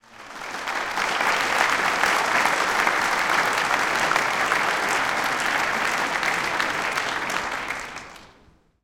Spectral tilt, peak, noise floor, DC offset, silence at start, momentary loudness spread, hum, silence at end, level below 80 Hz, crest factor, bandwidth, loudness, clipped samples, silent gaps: -1.5 dB/octave; -2 dBFS; -56 dBFS; under 0.1%; 0.1 s; 10 LU; none; 0.55 s; -56 dBFS; 20 dB; 17 kHz; -22 LUFS; under 0.1%; none